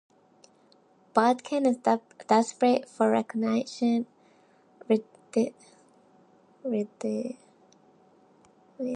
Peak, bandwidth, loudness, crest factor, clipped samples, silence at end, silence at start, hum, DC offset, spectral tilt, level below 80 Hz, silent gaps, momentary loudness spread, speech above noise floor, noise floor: -8 dBFS; 10 kHz; -27 LUFS; 22 dB; under 0.1%; 0 s; 1.15 s; none; under 0.1%; -5.5 dB/octave; -84 dBFS; none; 9 LU; 35 dB; -61 dBFS